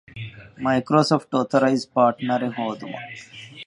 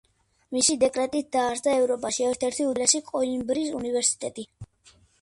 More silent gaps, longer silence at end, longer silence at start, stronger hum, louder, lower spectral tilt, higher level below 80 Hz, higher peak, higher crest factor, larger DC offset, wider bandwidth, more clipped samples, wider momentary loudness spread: neither; second, 0.05 s vs 0.55 s; second, 0.15 s vs 0.5 s; neither; first, -21 LUFS vs -25 LUFS; first, -6 dB/octave vs -2 dB/octave; about the same, -62 dBFS vs -60 dBFS; first, -2 dBFS vs -6 dBFS; about the same, 20 dB vs 20 dB; neither; about the same, 11.5 kHz vs 11.5 kHz; neither; first, 18 LU vs 9 LU